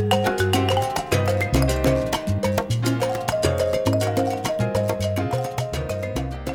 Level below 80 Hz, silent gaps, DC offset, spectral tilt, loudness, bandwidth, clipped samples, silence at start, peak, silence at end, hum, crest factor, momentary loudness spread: -36 dBFS; none; under 0.1%; -5.5 dB/octave; -22 LUFS; 19.5 kHz; under 0.1%; 0 s; -6 dBFS; 0 s; none; 16 dB; 7 LU